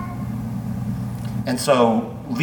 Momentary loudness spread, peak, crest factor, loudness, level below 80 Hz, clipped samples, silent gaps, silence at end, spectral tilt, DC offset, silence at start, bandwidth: 11 LU; -4 dBFS; 18 dB; -22 LUFS; -44 dBFS; under 0.1%; none; 0 s; -6 dB/octave; under 0.1%; 0 s; 19 kHz